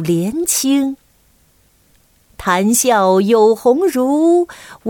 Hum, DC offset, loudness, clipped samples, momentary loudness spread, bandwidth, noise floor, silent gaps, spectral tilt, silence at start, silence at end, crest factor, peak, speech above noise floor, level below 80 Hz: none; under 0.1%; -14 LUFS; under 0.1%; 9 LU; 19 kHz; -54 dBFS; none; -4.5 dB/octave; 0 s; 0 s; 14 dB; -2 dBFS; 41 dB; -50 dBFS